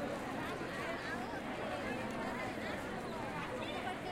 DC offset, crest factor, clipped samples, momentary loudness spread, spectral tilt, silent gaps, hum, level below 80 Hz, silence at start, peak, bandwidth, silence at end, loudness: under 0.1%; 14 dB; under 0.1%; 2 LU; -5 dB/octave; none; none; -62 dBFS; 0 s; -28 dBFS; 16.5 kHz; 0 s; -41 LUFS